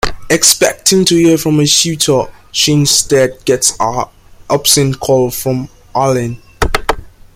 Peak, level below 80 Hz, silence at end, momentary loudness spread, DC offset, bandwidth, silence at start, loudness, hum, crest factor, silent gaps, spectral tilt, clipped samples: 0 dBFS; -32 dBFS; 0.25 s; 11 LU; under 0.1%; over 20 kHz; 0.05 s; -11 LUFS; none; 12 dB; none; -3.5 dB/octave; under 0.1%